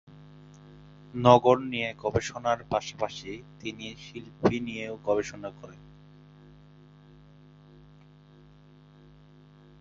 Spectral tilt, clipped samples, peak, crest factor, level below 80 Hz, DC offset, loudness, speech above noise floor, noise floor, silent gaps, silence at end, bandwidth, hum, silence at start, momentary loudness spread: -5.5 dB/octave; under 0.1%; -4 dBFS; 28 dB; -58 dBFS; under 0.1%; -27 LUFS; 27 dB; -54 dBFS; none; 4.05 s; 7.8 kHz; 50 Hz at -60 dBFS; 0.1 s; 21 LU